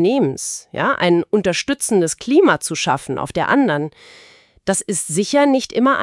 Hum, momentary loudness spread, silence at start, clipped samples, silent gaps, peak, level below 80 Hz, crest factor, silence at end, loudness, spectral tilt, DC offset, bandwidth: none; 8 LU; 0 s; under 0.1%; none; 0 dBFS; -54 dBFS; 18 dB; 0 s; -17 LUFS; -4 dB/octave; under 0.1%; 12 kHz